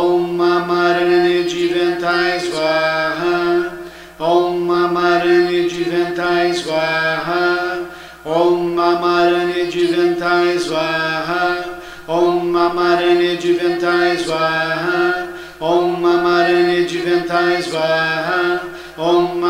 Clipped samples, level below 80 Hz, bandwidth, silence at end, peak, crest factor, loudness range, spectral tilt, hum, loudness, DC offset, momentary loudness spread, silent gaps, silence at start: under 0.1%; -50 dBFS; 12 kHz; 0 s; -2 dBFS; 14 dB; 1 LU; -5 dB/octave; none; -16 LUFS; under 0.1%; 6 LU; none; 0 s